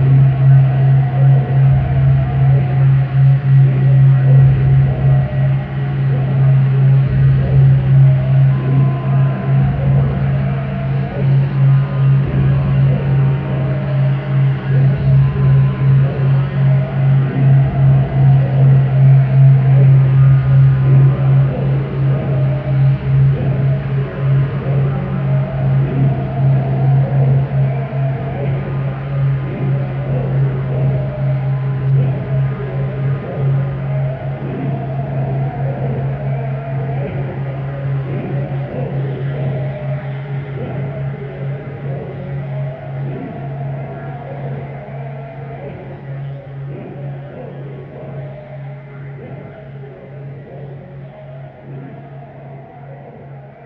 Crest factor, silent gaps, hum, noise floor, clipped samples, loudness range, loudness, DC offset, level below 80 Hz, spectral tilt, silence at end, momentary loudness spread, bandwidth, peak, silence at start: 12 dB; none; none; -34 dBFS; under 0.1%; 17 LU; -14 LUFS; under 0.1%; -34 dBFS; -12 dB/octave; 0 s; 19 LU; 3.5 kHz; -2 dBFS; 0 s